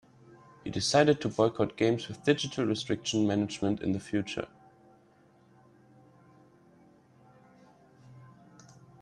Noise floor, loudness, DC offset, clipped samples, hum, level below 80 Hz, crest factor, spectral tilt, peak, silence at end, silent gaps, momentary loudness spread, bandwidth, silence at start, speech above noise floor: -62 dBFS; -29 LUFS; under 0.1%; under 0.1%; none; -66 dBFS; 22 dB; -5 dB/octave; -10 dBFS; 0.75 s; none; 12 LU; 11.5 kHz; 0.65 s; 33 dB